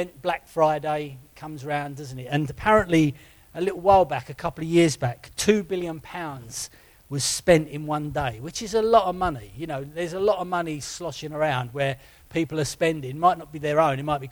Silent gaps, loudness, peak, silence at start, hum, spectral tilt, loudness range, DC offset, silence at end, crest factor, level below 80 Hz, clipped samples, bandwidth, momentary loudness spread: none; -24 LUFS; -4 dBFS; 0 s; none; -5 dB/octave; 4 LU; under 0.1%; 0 s; 20 dB; -50 dBFS; under 0.1%; over 20 kHz; 14 LU